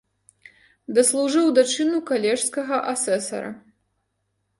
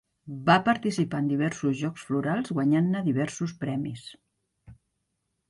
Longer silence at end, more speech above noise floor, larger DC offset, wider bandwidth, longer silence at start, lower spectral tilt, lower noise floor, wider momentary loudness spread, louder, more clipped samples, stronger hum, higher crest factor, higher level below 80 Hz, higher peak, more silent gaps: first, 1 s vs 0.75 s; about the same, 53 dB vs 52 dB; neither; about the same, 11.5 kHz vs 11.5 kHz; first, 0.9 s vs 0.25 s; second, -2.5 dB/octave vs -6.5 dB/octave; second, -74 dBFS vs -79 dBFS; second, 8 LU vs 11 LU; first, -21 LUFS vs -27 LUFS; neither; neither; about the same, 18 dB vs 22 dB; second, -72 dBFS vs -64 dBFS; about the same, -4 dBFS vs -6 dBFS; neither